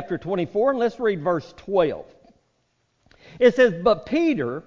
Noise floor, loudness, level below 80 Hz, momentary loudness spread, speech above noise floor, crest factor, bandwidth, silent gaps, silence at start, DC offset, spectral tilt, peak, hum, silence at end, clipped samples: -69 dBFS; -22 LUFS; -56 dBFS; 9 LU; 48 dB; 18 dB; 7.4 kHz; none; 0 s; under 0.1%; -7 dB/octave; -4 dBFS; none; 0.05 s; under 0.1%